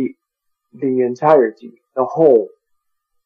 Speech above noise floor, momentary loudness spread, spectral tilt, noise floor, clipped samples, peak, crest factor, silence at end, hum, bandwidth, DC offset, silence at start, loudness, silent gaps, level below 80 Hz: 59 dB; 13 LU; -8.5 dB/octave; -74 dBFS; under 0.1%; 0 dBFS; 18 dB; 0.8 s; none; 6.6 kHz; under 0.1%; 0 s; -16 LUFS; none; -66 dBFS